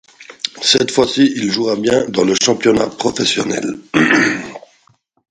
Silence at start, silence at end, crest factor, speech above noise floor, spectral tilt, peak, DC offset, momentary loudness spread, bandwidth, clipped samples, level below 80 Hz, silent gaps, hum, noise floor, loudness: 0.2 s; 0.75 s; 16 dB; 42 dB; -3 dB/octave; 0 dBFS; under 0.1%; 9 LU; 10.5 kHz; under 0.1%; -52 dBFS; none; none; -56 dBFS; -15 LUFS